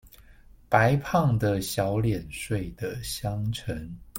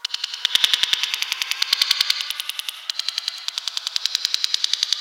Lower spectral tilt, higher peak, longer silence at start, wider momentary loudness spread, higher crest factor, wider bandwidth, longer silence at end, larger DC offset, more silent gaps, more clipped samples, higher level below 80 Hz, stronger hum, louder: first, -6 dB/octave vs 4 dB/octave; second, -6 dBFS vs 0 dBFS; about the same, 0.05 s vs 0.05 s; about the same, 11 LU vs 9 LU; about the same, 20 dB vs 24 dB; about the same, 16.5 kHz vs 17.5 kHz; about the same, 0 s vs 0 s; neither; neither; neither; first, -46 dBFS vs -68 dBFS; neither; second, -27 LUFS vs -20 LUFS